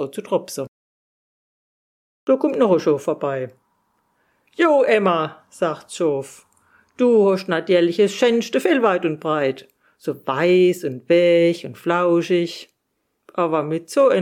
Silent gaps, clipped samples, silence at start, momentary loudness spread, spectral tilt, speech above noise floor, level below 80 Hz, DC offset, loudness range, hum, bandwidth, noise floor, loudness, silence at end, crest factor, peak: 0.68-2.27 s; under 0.1%; 0 s; 14 LU; -5.5 dB/octave; 55 dB; -74 dBFS; under 0.1%; 4 LU; none; 15 kHz; -73 dBFS; -19 LUFS; 0 s; 16 dB; -4 dBFS